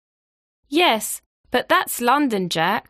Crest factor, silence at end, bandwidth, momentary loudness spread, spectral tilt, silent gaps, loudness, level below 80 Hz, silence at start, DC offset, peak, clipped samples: 16 dB; 0.1 s; 15.5 kHz; 7 LU; -3 dB/octave; 1.26-1.44 s; -20 LUFS; -60 dBFS; 0.7 s; under 0.1%; -4 dBFS; under 0.1%